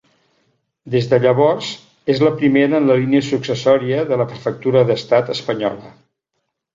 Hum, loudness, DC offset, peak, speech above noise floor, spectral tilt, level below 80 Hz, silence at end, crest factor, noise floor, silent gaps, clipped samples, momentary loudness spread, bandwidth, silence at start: none; -16 LUFS; under 0.1%; -2 dBFS; 58 dB; -7 dB/octave; -58 dBFS; 0.85 s; 16 dB; -74 dBFS; none; under 0.1%; 8 LU; 7.6 kHz; 0.85 s